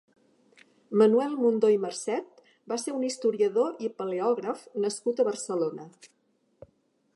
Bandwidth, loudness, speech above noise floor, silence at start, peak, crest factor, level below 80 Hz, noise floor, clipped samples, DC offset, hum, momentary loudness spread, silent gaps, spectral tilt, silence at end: 11.5 kHz; -27 LUFS; 43 dB; 0.9 s; -8 dBFS; 20 dB; -80 dBFS; -69 dBFS; under 0.1%; under 0.1%; none; 11 LU; none; -5 dB/octave; 1.1 s